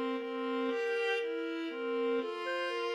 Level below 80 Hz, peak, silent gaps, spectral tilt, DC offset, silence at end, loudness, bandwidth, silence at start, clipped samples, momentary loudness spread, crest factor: under -90 dBFS; -22 dBFS; none; -2.5 dB/octave; under 0.1%; 0 s; -35 LUFS; 11 kHz; 0 s; under 0.1%; 4 LU; 12 dB